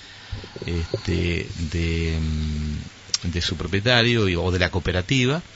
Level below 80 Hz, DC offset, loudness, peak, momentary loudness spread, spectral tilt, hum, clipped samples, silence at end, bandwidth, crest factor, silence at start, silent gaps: -34 dBFS; under 0.1%; -23 LUFS; -2 dBFS; 12 LU; -5 dB/octave; none; under 0.1%; 0 s; 8 kHz; 22 dB; 0 s; none